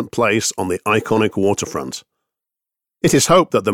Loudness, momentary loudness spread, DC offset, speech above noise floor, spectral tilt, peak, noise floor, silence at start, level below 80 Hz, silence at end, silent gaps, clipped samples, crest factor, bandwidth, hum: -17 LUFS; 12 LU; under 0.1%; 69 dB; -4 dB/octave; -2 dBFS; -86 dBFS; 0 s; -48 dBFS; 0 s; none; under 0.1%; 16 dB; 18.5 kHz; none